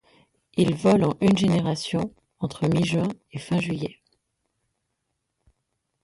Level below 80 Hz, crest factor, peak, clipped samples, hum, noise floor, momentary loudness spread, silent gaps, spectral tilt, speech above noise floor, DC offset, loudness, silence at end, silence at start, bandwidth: -56 dBFS; 18 dB; -8 dBFS; under 0.1%; none; -78 dBFS; 13 LU; none; -6.5 dB/octave; 56 dB; under 0.1%; -24 LUFS; 2.1 s; 0.55 s; 11.5 kHz